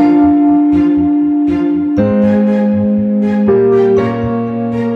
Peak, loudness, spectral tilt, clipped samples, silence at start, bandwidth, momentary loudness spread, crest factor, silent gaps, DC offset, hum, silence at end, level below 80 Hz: -2 dBFS; -12 LUFS; -10 dB/octave; under 0.1%; 0 s; 5 kHz; 7 LU; 10 dB; none; under 0.1%; none; 0 s; -40 dBFS